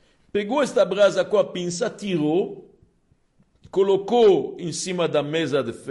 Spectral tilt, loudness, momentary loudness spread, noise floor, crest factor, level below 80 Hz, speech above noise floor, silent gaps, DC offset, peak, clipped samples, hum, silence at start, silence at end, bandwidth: -5 dB/octave; -22 LUFS; 11 LU; -63 dBFS; 14 dB; -64 dBFS; 42 dB; none; under 0.1%; -8 dBFS; under 0.1%; none; 0.35 s; 0 s; 11.5 kHz